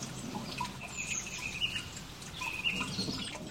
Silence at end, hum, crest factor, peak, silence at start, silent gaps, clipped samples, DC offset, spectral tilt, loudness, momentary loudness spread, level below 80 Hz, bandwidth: 0 s; none; 18 dB; -20 dBFS; 0 s; none; under 0.1%; under 0.1%; -2.5 dB/octave; -36 LUFS; 8 LU; -56 dBFS; 16 kHz